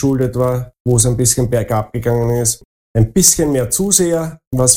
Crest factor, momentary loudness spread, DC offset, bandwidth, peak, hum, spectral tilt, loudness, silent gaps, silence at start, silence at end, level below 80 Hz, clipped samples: 14 dB; 10 LU; under 0.1%; over 20 kHz; 0 dBFS; none; -4.5 dB/octave; -14 LUFS; 0.80-0.85 s, 2.65-2.94 s, 4.47-4.51 s; 0 s; 0 s; -34 dBFS; under 0.1%